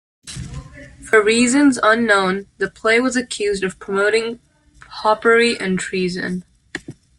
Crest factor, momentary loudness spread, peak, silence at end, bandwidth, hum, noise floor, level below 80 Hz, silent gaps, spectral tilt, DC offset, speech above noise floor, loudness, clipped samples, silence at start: 16 dB; 19 LU; -2 dBFS; 0.25 s; 11.5 kHz; none; -44 dBFS; -48 dBFS; none; -4 dB/octave; under 0.1%; 27 dB; -17 LUFS; under 0.1%; 0.25 s